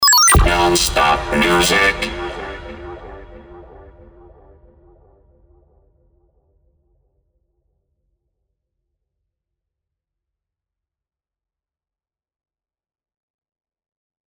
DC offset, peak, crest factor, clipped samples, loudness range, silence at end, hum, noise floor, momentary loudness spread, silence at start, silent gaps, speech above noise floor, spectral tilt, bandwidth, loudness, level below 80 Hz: under 0.1%; -2 dBFS; 20 dB; under 0.1%; 25 LU; 10.65 s; none; under -90 dBFS; 24 LU; 0 s; none; over 74 dB; -2.5 dB/octave; over 20 kHz; -14 LUFS; -32 dBFS